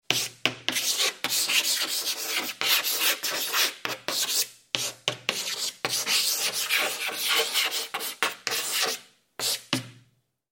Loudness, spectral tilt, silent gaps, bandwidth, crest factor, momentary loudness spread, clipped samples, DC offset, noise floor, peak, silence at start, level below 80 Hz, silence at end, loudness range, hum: -25 LUFS; 0.5 dB/octave; none; 17 kHz; 28 dB; 7 LU; under 0.1%; under 0.1%; -66 dBFS; -2 dBFS; 0.1 s; -76 dBFS; 0.6 s; 2 LU; none